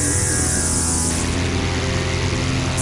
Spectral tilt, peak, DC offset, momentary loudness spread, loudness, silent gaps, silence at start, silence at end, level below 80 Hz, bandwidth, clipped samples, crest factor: -3.5 dB/octave; -6 dBFS; under 0.1%; 4 LU; -19 LUFS; none; 0 s; 0 s; -32 dBFS; 11.5 kHz; under 0.1%; 14 dB